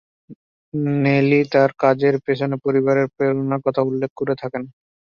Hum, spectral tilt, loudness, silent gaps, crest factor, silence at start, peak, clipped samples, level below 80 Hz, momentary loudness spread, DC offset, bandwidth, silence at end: none; -8.5 dB/octave; -19 LUFS; 0.35-0.72 s, 4.10-4.16 s; 18 dB; 0.3 s; -2 dBFS; under 0.1%; -62 dBFS; 9 LU; under 0.1%; 6.8 kHz; 0.35 s